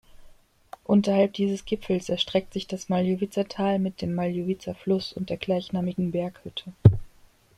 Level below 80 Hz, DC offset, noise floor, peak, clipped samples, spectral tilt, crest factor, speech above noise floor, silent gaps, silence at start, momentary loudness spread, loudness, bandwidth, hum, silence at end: -50 dBFS; under 0.1%; -56 dBFS; -2 dBFS; under 0.1%; -7 dB/octave; 24 dB; 30 dB; none; 0.2 s; 12 LU; -26 LUFS; 12 kHz; none; 0.5 s